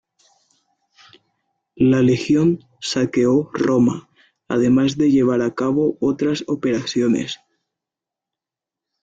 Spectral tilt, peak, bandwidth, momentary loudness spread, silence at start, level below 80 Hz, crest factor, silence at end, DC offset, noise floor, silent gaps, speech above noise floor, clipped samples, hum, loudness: -6.5 dB/octave; -6 dBFS; 7.8 kHz; 7 LU; 1.75 s; -54 dBFS; 14 dB; 1.65 s; under 0.1%; -87 dBFS; none; 70 dB; under 0.1%; none; -18 LUFS